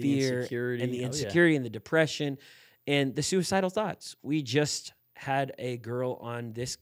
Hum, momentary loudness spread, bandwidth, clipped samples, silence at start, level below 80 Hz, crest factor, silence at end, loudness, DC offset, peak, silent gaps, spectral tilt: none; 12 LU; 16 kHz; under 0.1%; 0 s; -68 dBFS; 20 dB; 0.05 s; -29 LUFS; under 0.1%; -10 dBFS; none; -5 dB/octave